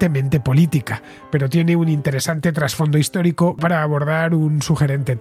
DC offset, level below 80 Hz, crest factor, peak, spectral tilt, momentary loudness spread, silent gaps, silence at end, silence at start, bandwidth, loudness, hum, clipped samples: under 0.1%; -48 dBFS; 14 dB; -4 dBFS; -6.5 dB/octave; 4 LU; none; 0 s; 0 s; 15.5 kHz; -18 LUFS; none; under 0.1%